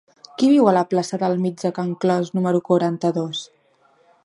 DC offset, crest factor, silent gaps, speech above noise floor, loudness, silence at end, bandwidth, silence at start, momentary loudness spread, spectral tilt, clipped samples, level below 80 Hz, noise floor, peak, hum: under 0.1%; 18 dB; none; 40 dB; -20 LUFS; 0.8 s; 11.5 kHz; 0.4 s; 10 LU; -6.5 dB/octave; under 0.1%; -70 dBFS; -59 dBFS; -2 dBFS; none